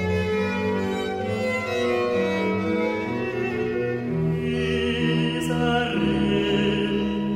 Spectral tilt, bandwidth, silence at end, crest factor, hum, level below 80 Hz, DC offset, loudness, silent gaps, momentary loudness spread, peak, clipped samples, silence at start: -6.5 dB/octave; 15.5 kHz; 0 s; 14 dB; none; -44 dBFS; under 0.1%; -24 LUFS; none; 4 LU; -10 dBFS; under 0.1%; 0 s